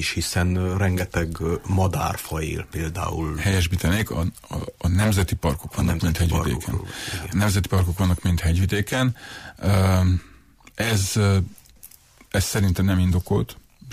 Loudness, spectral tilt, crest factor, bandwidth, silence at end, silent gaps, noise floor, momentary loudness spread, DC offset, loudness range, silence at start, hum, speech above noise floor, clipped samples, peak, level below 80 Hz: -23 LUFS; -5.5 dB/octave; 12 dB; 15.5 kHz; 0 s; none; -49 dBFS; 8 LU; under 0.1%; 2 LU; 0 s; none; 27 dB; under 0.1%; -10 dBFS; -34 dBFS